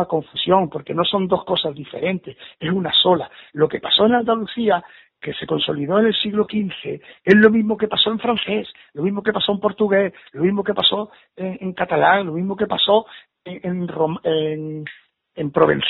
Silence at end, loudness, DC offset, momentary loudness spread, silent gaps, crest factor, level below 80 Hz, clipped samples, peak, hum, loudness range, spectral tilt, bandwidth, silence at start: 0 s; -19 LUFS; under 0.1%; 15 LU; none; 20 dB; -58 dBFS; under 0.1%; 0 dBFS; none; 3 LU; -3 dB/octave; 4.8 kHz; 0 s